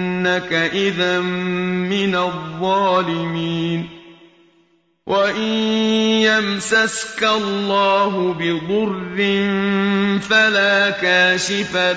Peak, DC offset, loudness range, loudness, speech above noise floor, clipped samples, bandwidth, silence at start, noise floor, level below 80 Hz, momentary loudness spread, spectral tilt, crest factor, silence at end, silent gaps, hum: -4 dBFS; under 0.1%; 5 LU; -17 LUFS; 41 dB; under 0.1%; 8 kHz; 0 s; -59 dBFS; -56 dBFS; 8 LU; -4.5 dB/octave; 14 dB; 0 s; none; none